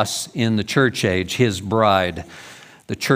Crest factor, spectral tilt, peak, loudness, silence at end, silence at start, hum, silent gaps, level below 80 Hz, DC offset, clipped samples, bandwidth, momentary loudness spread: 18 dB; -5 dB/octave; -2 dBFS; -19 LUFS; 0 s; 0 s; none; none; -52 dBFS; under 0.1%; under 0.1%; 16 kHz; 18 LU